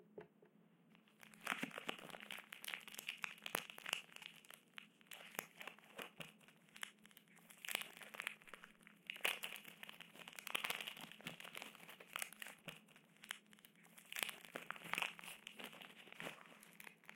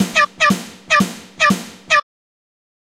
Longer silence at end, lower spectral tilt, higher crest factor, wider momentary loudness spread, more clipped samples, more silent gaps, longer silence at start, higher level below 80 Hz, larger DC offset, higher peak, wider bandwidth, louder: second, 0 s vs 1 s; second, -1 dB/octave vs -3.5 dB/octave; first, 38 dB vs 18 dB; first, 19 LU vs 9 LU; neither; neither; about the same, 0 s vs 0 s; second, under -90 dBFS vs -52 dBFS; neither; second, -14 dBFS vs -2 dBFS; about the same, 17 kHz vs 16 kHz; second, -49 LUFS vs -16 LUFS